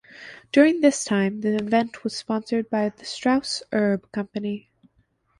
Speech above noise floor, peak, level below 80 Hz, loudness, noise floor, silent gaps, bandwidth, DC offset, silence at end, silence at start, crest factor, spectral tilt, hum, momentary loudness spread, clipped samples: 43 dB; -4 dBFS; -64 dBFS; -23 LUFS; -66 dBFS; none; 11.5 kHz; under 0.1%; 0.8 s; 0.15 s; 18 dB; -5 dB/octave; none; 12 LU; under 0.1%